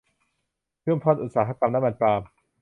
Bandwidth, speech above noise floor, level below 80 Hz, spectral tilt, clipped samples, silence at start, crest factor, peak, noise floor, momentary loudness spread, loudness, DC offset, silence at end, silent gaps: 3.8 kHz; 57 dB; -60 dBFS; -9.5 dB/octave; under 0.1%; 0.85 s; 20 dB; -6 dBFS; -80 dBFS; 5 LU; -24 LUFS; under 0.1%; 0.35 s; none